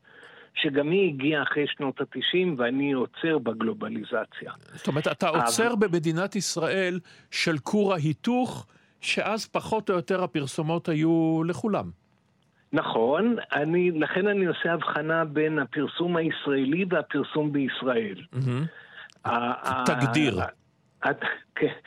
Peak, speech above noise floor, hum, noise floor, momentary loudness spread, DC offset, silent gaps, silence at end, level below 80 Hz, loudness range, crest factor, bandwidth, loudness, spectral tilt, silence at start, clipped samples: -8 dBFS; 40 dB; none; -66 dBFS; 8 LU; under 0.1%; none; 0.05 s; -68 dBFS; 2 LU; 20 dB; 16 kHz; -26 LUFS; -5 dB/octave; 0.2 s; under 0.1%